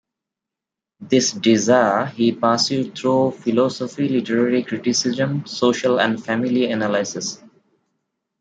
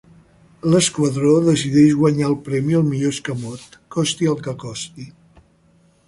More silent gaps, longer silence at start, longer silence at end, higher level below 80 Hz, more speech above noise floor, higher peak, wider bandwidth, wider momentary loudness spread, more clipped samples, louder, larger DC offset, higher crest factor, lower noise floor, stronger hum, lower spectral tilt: neither; first, 1 s vs 0.65 s; about the same, 1.05 s vs 0.95 s; second, -66 dBFS vs -54 dBFS; first, 67 dB vs 38 dB; about the same, -2 dBFS vs -2 dBFS; second, 9.2 kHz vs 11.5 kHz; second, 6 LU vs 16 LU; neither; about the same, -19 LUFS vs -18 LUFS; neither; about the same, 18 dB vs 16 dB; first, -86 dBFS vs -56 dBFS; neither; about the same, -4.5 dB/octave vs -5.5 dB/octave